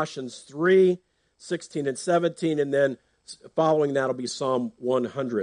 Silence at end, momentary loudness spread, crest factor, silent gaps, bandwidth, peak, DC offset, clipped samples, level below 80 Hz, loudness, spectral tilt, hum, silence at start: 0 s; 14 LU; 16 dB; none; 10 kHz; -10 dBFS; under 0.1%; under 0.1%; -72 dBFS; -25 LUFS; -5.5 dB/octave; none; 0 s